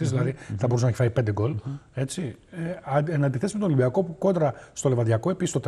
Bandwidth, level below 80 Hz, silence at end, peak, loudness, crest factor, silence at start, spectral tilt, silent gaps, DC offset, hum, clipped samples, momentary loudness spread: 12 kHz; -58 dBFS; 0 s; -10 dBFS; -26 LUFS; 14 dB; 0 s; -7 dB/octave; none; under 0.1%; none; under 0.1%; 10 LU